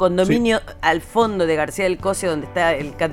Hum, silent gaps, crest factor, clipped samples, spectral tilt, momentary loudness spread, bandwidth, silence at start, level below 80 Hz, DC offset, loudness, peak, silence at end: none; none; 16 dB; under 0.1%; -5 dB/octave; 5 LU; 16.5 kHz; 0 s; -42 dBFS; under 0.1%; -19 LUFS; -2 dBFS; 0 s